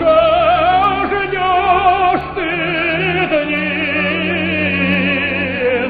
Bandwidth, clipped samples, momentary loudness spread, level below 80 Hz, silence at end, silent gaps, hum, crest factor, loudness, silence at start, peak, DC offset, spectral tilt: 4.9 kHz; under 0.1%; 5 LU; -38 dBFS; 0 s; none; none; 12 dB; -14 LUFS; 0 s; -2 dBFS; under 0.1%; -8.5 dB/octave